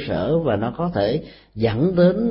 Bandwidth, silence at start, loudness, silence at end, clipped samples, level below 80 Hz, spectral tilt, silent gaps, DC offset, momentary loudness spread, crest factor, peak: 5.8 kHz; 0 s; -21 LUFS; 0 s; under 0.1%; -44 dBFS; -12.5 dB/octave; none; under 0.1%; 8 LU; 16 dB; -4 dBFS